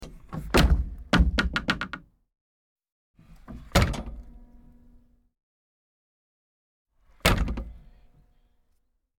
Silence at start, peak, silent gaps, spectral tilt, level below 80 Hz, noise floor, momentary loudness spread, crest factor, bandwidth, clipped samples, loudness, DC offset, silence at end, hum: 0 s; -4 dBFS; 2.41-2.76 s, 2.92-3.14 s, 5.43-6.85 s; -5 dB/octave; -32 dBFS; -70 dBFS; 21 LU; 26 dB; 18 kHz; under 0.1%; -26 LUFS; under 0.1%; 1.4 s; none